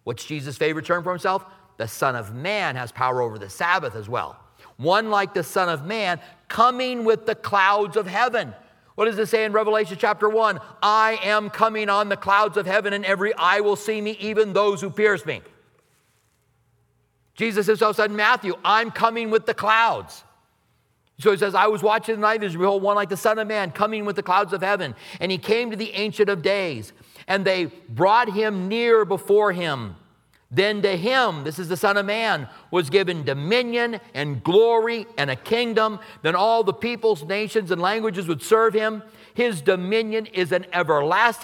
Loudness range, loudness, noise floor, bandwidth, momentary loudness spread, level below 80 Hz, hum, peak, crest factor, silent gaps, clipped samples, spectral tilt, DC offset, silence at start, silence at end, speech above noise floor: 4 LU; -22 LUFS; -66 dBFS; 17 kHz; 9 LU; -68 dBFS; none; -2 dBFS; 20 dB; none; under 0.1%; -4.5 dB/octave; under 0.1%; 0.05 s; 0 s; 44 dB